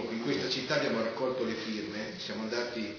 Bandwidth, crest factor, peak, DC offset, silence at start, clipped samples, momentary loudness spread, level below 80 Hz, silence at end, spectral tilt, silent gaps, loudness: 5.4 kHz; 16 dB; -16 dBFS; under 0.1%; 0 s; under 0.1%; 7 LU; -68 dBFS; 0 s; -3 dB/octave; none; -33 LUFS